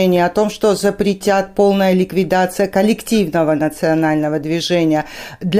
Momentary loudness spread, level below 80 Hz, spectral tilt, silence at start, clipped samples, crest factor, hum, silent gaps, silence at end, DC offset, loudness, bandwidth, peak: 4 LU; -46 dBFS; -5.5 dB/octave; 0 s; under 0.1%; 14 dB; none; none; 0 s; under 0.1%; -16 LUFS; 16 kHz; 0 dBFS